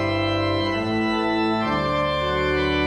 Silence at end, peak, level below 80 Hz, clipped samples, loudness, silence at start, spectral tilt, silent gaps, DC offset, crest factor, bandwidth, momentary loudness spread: 0 s; -10 dBFS; -40 dBFS; under 0.1%; -22 LUFS; 0 s; -6.5 dB/octave; none; under 0.1%; 12 dB; 11 kHz; 1 LU